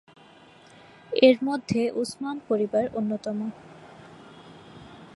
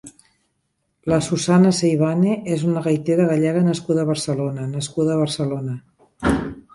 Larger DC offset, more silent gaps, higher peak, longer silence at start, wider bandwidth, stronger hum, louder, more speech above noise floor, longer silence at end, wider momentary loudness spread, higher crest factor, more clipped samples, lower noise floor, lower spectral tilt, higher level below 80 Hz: neither; neither; about the same, -4 dBFS vs -4 dBFS; first, 1.1 s vs 0.05 s; about the same, 11.5 kHz vs 11.5 kHz; neither; second, -25 LUFS vs -20 LUFS; second, 28 dB vs 52 dB; about the same, 0.1 s vs 0.15 s; first, 28 LU vs 9 LU; first, 24 dB vs 16 dB; neither; second, -52 dBFS vs -71 dBFS; about the same, -5.5 dB/octave vs -6.5 dB/octave; second, -66 dBFS vs -44 dBFS